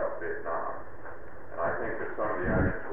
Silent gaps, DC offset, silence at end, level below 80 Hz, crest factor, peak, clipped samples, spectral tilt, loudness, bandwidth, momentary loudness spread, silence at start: none; 2%; 0 s; -44 dBFS; 18 dB; -14 dBFS; under 0.1%; -10.5 dB/octave; -32 LUFS; 3.7 kHz; 17 LU; 0 s